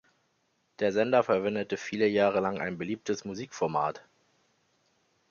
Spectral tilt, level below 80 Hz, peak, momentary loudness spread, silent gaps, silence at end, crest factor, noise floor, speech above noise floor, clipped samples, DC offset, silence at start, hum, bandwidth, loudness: -5.5 dB/octave; -68 dBFS; -10 dBFS; 10 LU; none; 1.3 s; 20 dB; -74 dBFS; 45 dB; under 0.1%; under 0.1%; 0.8 s; none; 7.2 kHz; -29 LUFS